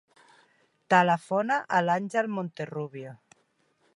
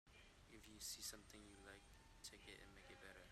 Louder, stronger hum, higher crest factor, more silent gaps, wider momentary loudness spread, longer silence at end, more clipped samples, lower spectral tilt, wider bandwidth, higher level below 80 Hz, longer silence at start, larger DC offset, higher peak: first, -26 LUFS vs -58 LUFS; neither; about the same, 22 dB vs 22 dB; neither; about the same, 15 LU vs 14 LU; first, 0.8 s vs 0 s; neither; first, -6 dB/octave vs -1.5 dB/octave; second, 11.5 kHz vs 15.5 kHz; second, -80 dBFS vs -72 dBFS; first, 0.9 s vs 0.05 s; neither; first, -8 dBFS vs -38 dBFS